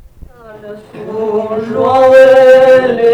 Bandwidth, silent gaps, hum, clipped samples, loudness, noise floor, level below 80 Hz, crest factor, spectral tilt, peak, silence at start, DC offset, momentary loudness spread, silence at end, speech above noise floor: 8.8 kHz; none; none; 0.4%; -7 LUFS; -34 dBFS; -44 dBFS; 8 dB; -5.5 dB/octave; 0 dBFS; 0.5 s; under 0.1%; 15 LU; 0 s; 25 dB